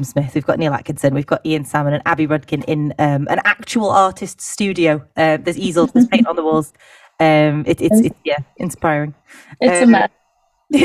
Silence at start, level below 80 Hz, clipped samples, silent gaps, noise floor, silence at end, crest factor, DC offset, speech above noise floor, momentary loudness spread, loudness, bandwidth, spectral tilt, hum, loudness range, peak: 0 s; -50 dBFS; under 0.1%; none; -62 dBFS; 0 s; 16 dB; under 0.1%; 47 dB; 8 LU; -16 LUFS; 14.5 kHz; -5.5 dB/octave; none; 2 LU; 0 dBFS